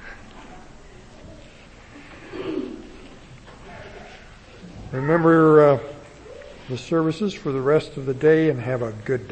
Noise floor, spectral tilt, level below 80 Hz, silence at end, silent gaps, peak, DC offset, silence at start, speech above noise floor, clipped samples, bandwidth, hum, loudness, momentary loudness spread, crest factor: -45 dBFS; -7.5 dB/octave; -50 dBFS; 0 s; none; -4 dBFS; under 0.1%; 0 s; 26 dB; under 0.1%; 8.6 kHz; none; -20 LUFS; 27 LU; 20 dB